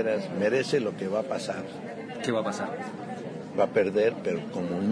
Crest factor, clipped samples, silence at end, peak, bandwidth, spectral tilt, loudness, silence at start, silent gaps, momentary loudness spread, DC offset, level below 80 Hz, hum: 16 dB; under 0.1%; 0 s; -12 dBFS; 10.5 kHz; -5.5 dB/octave; -29 LUFS; 0 s; none; 12 LU; under 0.1%; -72 dBFS; none